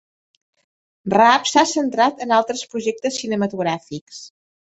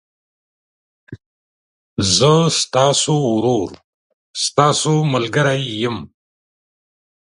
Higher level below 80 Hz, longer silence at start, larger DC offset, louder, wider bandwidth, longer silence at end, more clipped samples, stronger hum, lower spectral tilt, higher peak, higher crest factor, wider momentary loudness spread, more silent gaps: second, -64 dBFS vs -50 dBFS; about the same, 1.05 s vs 1.1 s; neither; about the same, -18 LUFS vs -16 LUFS; second, 8.2 kHz vs 11.5 kHz; second, 0.4 s vs 1.3 s; neither; neither; about the same, -3.5 dB/octave vs -4 dB/octave; about the same, -2 dBFS vs 0 dBFS; about the same, 20 dB vs 18 dB; first, 19 LU vs 10 LU; second, 4.01-4.07 s vs 1.26-1.96 s, 3.84-4.34 s